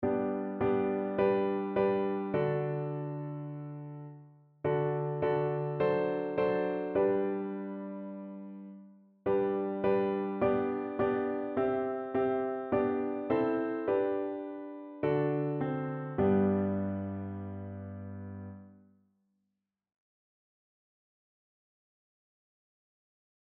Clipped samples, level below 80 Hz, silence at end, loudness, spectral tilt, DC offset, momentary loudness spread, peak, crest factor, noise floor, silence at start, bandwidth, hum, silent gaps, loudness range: under 0.1%; -66 dBFS; 4.7 s; -32 LUFS; -7.5 dB/octave; under 0.1%; 14 LU; -16 dBFS; 18 dB; -85 dBFS; 0 s; 4.5 kHz; none; none; 5 LU